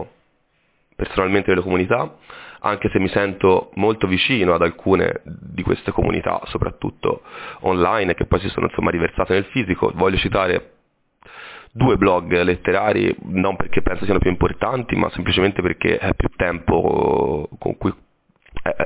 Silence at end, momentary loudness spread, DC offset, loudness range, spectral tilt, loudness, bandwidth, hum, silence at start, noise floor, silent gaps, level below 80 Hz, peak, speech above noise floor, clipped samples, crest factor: 0 s; 9 LU; under 0.1%; 3 LU; -10.5 dB/octave; -19 LUFS; 4 kHz; none; 0 s; -64 dBFS; none; -34 dBFS; -4 dBFS; 45 dB; under 0.1%; 16 dB